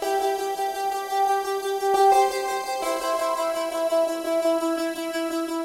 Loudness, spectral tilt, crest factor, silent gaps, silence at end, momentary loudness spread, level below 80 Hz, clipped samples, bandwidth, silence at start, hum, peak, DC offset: -24 LUFS; -1.5 dB/octave; 14 dB; none; 0 s; 8 LU; -64 dBFS; under 0.1%; 16 kHz; 0 s; none; -10 dBFS; under 0.1%